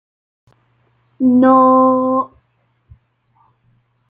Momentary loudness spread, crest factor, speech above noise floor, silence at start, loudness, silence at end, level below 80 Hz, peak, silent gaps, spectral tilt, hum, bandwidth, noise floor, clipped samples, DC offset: 10 LU; 14 dB; 51 dB; 1.2 s; -12 LUFS; 1.85 s; -60 dBFS; -2 dBFS; none; -10 dB/octave; none; 3.8 kHz; -62 dBFS; under 0.1%; under 0.1%